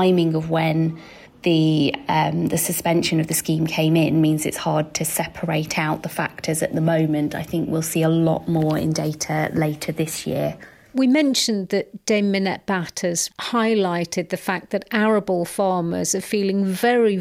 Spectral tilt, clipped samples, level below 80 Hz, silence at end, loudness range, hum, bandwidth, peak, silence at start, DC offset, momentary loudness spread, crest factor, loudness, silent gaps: -5 dB/octave; under 0.1%; -54 dBFS; 0 s; 2 LU; none; 16.5 kHz; -6 dBFS; 0 s; under 0.1%; 7 LU; 14 dB; -21 LUFS; none